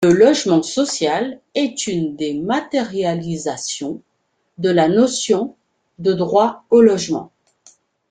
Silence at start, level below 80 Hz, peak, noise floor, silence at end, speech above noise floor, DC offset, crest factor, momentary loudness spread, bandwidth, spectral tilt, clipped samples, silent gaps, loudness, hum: 0 s; -58 dBFS; -2 dBFS; -68 dBFS; 0.85 s; 51 dB; under 0.1%; 16 dB; 11 LU; 9.6 kHz; -4.5 dB/octave; under 0.1%; none; -18 LUFS; none